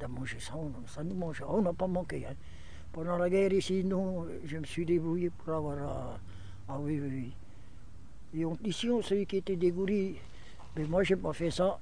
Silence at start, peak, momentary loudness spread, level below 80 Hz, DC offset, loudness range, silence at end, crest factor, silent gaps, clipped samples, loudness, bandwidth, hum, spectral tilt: 0 s; -16 dBFS; 16 LU; -52 dBFS; 0.8%; 6 LU; 0 s; 18 dB; none; under 0.1%; -33 LUFS; 10 kHz; none; -6.5 dB/octave